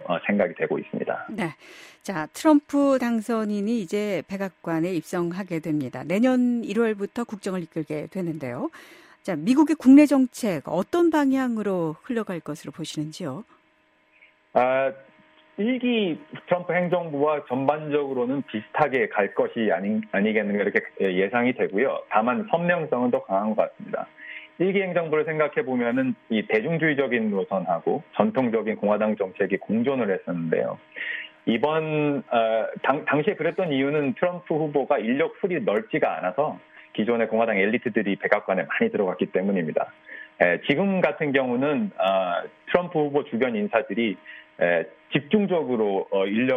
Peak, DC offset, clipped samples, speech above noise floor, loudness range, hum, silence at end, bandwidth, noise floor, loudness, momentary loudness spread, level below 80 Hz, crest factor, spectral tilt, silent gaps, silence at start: -4 dBFS; under 0.1%; under 0.1%; 39 dB; 5 LU; none; 0 s; 14.5 kHz; -63 dBFS; -24 LUFS; 9 LU; -70 dBFS; 20 dB; -6.5 dB/octave; none; 0 s